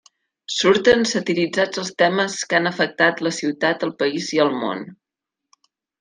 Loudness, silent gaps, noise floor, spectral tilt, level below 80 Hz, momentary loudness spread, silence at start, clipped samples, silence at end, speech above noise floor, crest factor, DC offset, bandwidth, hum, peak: -19 LUFS; none; -84 dBFS; -3.5 dB/octave; -60 dBFS; 10 LU; 0.5 s; under 0.1%; 1.05 s; 65 dB; 18 dB; under 0.1%; 10 kHz; none; -2 dBFS